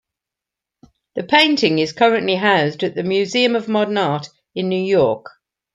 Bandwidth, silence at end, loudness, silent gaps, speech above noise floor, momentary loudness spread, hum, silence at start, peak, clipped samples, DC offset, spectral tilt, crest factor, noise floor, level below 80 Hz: 11.5 kHz; 0.45 s; -17 LUFS; none; 68 dB; 12 LU; none; 1.15 s; 0 dBFS; under 0.1%; under 0.1%; -5 dB/octave; 18 dB; -85 dBFS; -62 dBFS